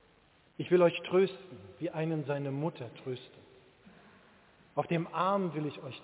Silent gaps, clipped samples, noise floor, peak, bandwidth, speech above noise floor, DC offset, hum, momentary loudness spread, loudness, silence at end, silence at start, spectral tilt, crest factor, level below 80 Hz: none; under 0.1%; -65 dBFS; -14 dBFS; 4 kHz; 33 dB; under 0.1%; none; 17 LU; -32 LUFS; 0 s; 0.6 s; -6 dB/octave; 20 dB; -74 dBFS